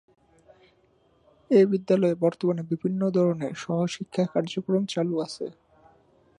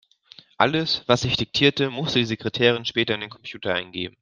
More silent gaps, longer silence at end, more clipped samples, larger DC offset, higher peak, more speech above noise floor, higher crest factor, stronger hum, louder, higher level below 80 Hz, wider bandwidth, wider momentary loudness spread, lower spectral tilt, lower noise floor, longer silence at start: neither; first, 0.9 s vs 0.1 s; neither; neither; second, -8 dBFS vs -2 dBFS; first, 39 dB vs 28 dB; about the same, 18 dB vs 22 dB; neither; second, -25 LUFS vs -22 LUFS; second, -70 dBFS vs -54 dBFS; about the same, 10.5 kHz vs 9.8 kHz; about the same, 9 LU vs 8 LU; first, -7 dB/octave vs -5 dB/octave; first, -63 dBFS vs -51 dBFS; first, 1.5 s vs 0.6 s